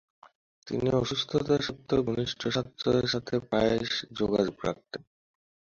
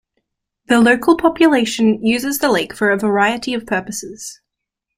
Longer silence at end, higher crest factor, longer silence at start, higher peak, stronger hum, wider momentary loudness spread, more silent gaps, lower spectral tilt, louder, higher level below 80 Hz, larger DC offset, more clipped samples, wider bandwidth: first, 0.8 s vs 0.65 s; about the same, 20 dB vs 16 dB; about the same, 0.65 s vs 0.7 s; second, -10 dBFS vs 0 dBFS; neither; second, 8 LU vs 14 LU; neither; first, -5.5 dB/octave vs -4 dB/octave; second, -29 LUFS vs -15 LUFS; about the same, -54 dBFS vs -52 dBFS; neither; neither; second, 7.6 kHz vs 16 kHz